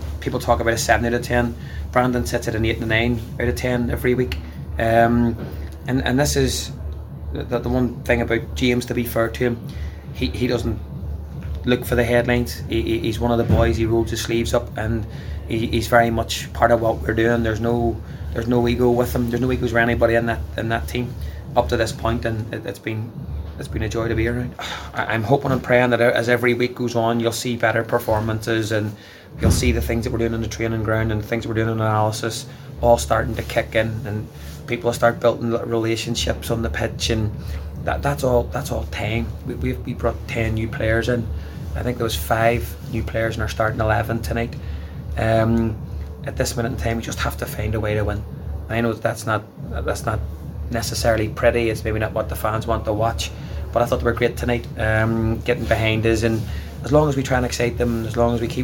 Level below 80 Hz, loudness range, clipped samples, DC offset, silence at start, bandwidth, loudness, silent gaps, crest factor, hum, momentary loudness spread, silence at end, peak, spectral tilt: -32 dBFS; 4 LU; under 0.1%; under 0.1%; 0 s; 17 kHz; -21 LUFS; none; 20 dB; none; 12 LU; 0 s; 0 dBFS; -5.5 dB/octave